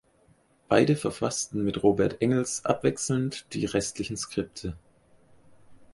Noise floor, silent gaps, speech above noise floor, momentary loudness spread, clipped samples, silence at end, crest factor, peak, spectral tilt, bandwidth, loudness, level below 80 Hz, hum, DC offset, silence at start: -63 dBFS; none; 36 dB; 9 LU; under 0.1%; 0.1 s; 22 dB; -6 dBFS; -5 dB/octave; 11.5 kHz; -27 LUFS; -54 dBFS; none; under 0.1%; 0.7 s